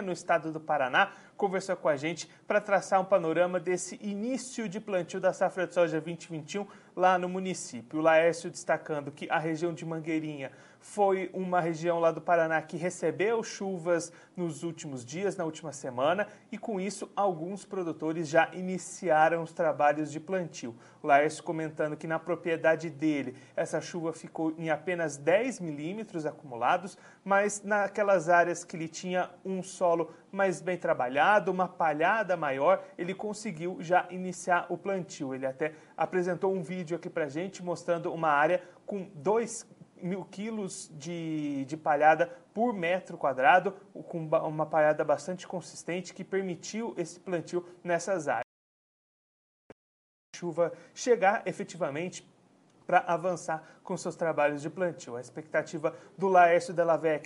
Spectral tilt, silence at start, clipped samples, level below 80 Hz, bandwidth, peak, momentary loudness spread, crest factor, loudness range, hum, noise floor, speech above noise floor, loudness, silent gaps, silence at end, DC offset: -5 dB/octave; 0 s; under 0.1%; -82 dBFS; 11.5 kHz; -8 dBFS; 13 LU; 22 dB; 5 LU; none; -63 dBFS; 33 dB; -30 LUFS; 48.44-50.33 s; 0 s; under 0.1%